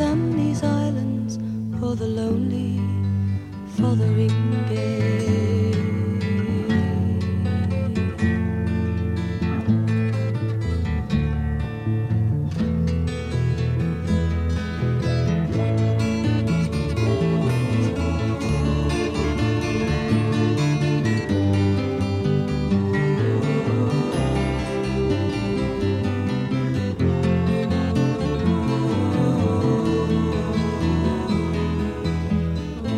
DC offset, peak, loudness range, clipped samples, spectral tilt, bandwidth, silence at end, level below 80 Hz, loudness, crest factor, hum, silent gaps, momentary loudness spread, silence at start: under 0.1%; -8 dBFS; 2 LU; under 0.1%; -7.5 dB/octave; 11 kHz; 0 s; -36 dBFS; -22 LUFS; 14 dB; none; none; 4 LU; 0 s